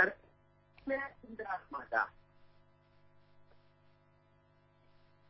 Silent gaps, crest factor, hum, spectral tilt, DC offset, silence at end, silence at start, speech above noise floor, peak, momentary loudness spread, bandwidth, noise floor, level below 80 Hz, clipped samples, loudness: none; 28 dB; 50 Hz at -70 dBFS; -2.5 dB/octave; under 0.1%; 2.85 s; 0 s; 30 dB; -14 dBFS; 13 LU; 5.6 kHz; -68 dBFS; -72 dBFS; under 0.1%; -38 LUFS